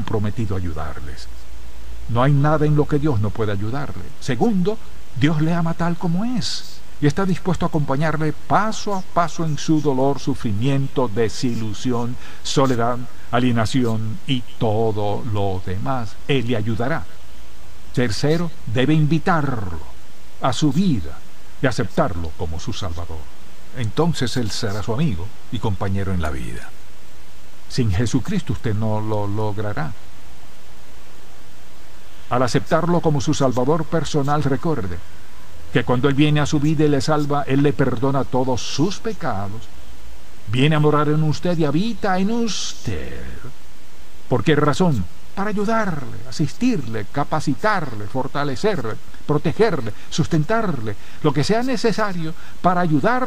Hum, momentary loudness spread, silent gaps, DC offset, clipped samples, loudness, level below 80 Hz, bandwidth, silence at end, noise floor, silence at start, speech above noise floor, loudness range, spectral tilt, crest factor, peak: none; 13 LU; none; 9%; under 0.1%; -21 LUFS; -42 dBFS; 15.5 kHz; 0 s; -45 dBFS; 0 s; 25 dB; 5 LU; -6 dB/octave; 16 dB; -4 dBFS